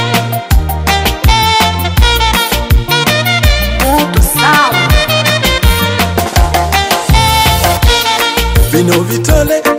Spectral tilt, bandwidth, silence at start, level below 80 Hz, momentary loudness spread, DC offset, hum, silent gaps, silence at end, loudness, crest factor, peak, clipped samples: -4 dB/octave; 16.5 kHz; 0 s; -14 dBFS; 3 LU; under 0.1%; none; none; 0 s; -10 LUFS; 10 dB; 0 dBFS; under 0.1%